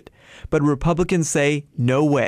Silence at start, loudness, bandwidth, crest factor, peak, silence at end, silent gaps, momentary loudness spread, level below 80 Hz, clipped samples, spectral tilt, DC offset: 0.5 s; -20 LUFS; 15 kHz; 12 dB; -8 dBFS; 0 s; none; 4 LU; -38 dBFS; under 0.1%; -6 dB/octave; under 0.1%